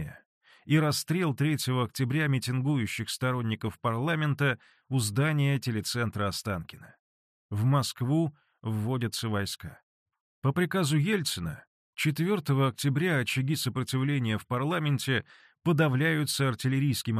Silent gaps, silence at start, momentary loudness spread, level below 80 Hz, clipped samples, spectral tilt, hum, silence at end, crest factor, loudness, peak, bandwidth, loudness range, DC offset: 0.26-0.41 s, 6.99-7.49 s, 9.83-10.06 s, 10.20-10.42 s, 11.67-11.93 s; 0 s; 8 LU; -62 dBFS; under 0.1%; -5.5 dB/octave; none; 0 s; 16 dB; -29 LUFS; -12 dBFS; 14 kHz; 3 LU; under 0.1%